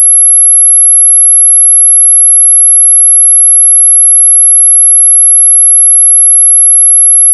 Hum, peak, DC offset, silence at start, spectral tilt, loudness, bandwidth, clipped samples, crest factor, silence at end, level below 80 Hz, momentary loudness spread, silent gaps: none; 0 dBFS; 2%; 0 s; 2.5 dB/octave; 0 LUFS; over 20 kHz; 5%; 2 dB; 0 s; under -90 dBFS; 0 LU; none